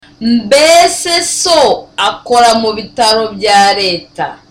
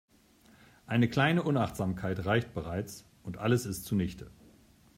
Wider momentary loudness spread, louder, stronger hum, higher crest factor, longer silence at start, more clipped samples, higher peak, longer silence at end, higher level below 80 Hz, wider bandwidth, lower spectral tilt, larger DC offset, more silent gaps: second, 8 LU vs 17 LU; first, -9 LUFS vs -31 LUFS; neither; second, 10 dB vs 18 dB; second, 0.2 s vs 0.9 s; neither; first, 0 dBFS vs -14 dBFS; second, 0.15 s vs 0.7 s; first, -46 dBFS vs -58 dBFS; about the same, 16.5 kHz vs 16 kHz; second, -2 dB/octave vs -6 dB/octave; neither; neither